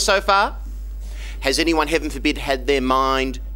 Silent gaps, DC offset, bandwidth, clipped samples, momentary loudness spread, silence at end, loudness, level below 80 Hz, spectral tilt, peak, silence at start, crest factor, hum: none; under 0.1%; 16.5 kHz; under 0.1%; 17 LU; 0 s; -19 LUFS; -30 dBFS; -3.5 dB/octave; 0 dBFS; 0 s; 20 dB; none